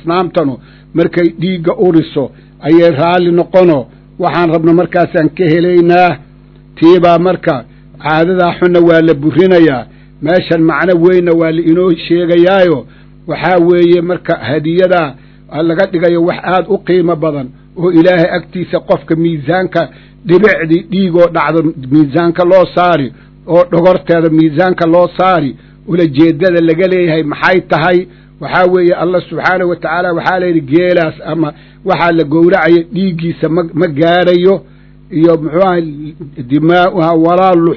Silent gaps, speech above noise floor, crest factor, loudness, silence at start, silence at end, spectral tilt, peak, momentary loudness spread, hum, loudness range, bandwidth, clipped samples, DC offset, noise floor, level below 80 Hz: none; 28 dB; 10 dB; -10 LUFS; 0.05 s; 0 s; -9 dB/octave; 0 dBFS; 9 LU; none; 2 LU; 6 kHz; 2%; under 0.1%; -38 dBFS; -42 dBFS